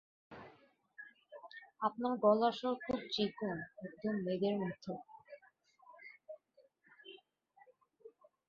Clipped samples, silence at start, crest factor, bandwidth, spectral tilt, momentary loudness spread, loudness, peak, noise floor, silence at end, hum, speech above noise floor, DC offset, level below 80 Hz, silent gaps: under 0.1%; 0.3 s; 24 dB; 7 kHz; -4 dB/octave; 24 LU; -37 LUFS; -16 dBFS; -71 dBFS; 0.4 s; none; 35 dB; under 0.1%; -76 dBFS; none